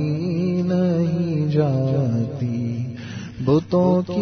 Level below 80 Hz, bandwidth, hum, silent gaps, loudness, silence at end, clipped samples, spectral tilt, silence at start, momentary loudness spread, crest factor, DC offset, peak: -52 dBFS; 6.4 kHz; none; none; -21 LUFS; 0 s; under 0.1%; -9 dB/octave; 0 s; 9 LU; 14 dB; under 0.1%; -6 dBFS